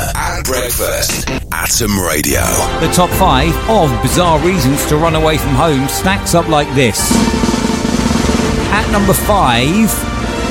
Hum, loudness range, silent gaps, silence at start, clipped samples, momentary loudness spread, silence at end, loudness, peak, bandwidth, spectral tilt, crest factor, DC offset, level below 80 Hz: none; 1 LU; none; 0 s; under 0.1%; 4 LU; 0 s; -12 LUFS; 0 dBFS; 17 kHz; -4 dB/octave; 12 dB; under 0.1%; -22 dBFS